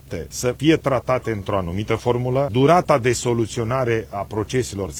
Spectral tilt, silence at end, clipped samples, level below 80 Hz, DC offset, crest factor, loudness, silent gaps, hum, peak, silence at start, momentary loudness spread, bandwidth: -5.5 dB/octave; 0 s; under 0.1%; -44 dBFS; under 0.1%; 18 dB; -21 LUFS; none; none; -2 dBFS; 0.05 s; 8 LU; 17 kHz